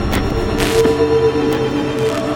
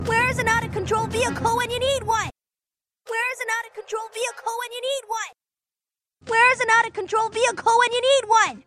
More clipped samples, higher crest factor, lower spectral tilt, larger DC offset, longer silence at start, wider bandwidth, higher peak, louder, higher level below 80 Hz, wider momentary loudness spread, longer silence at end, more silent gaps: neither; about the same, 14 dB vs 18 dB; first, -5.5 dB/octave vs -2.5 dB/octave; neither; about the same, 0 s vs 0 s; first, 17 kHz vs 15 kHz; first, -2 dBFS vs -6 dBFS; first, -16 LUFS vs -22 LUFS; first, -28 dBFS vs -52 dBFS; second, 4 LU vs 12 LU; about the same, 0 s vs 0.05 s; neither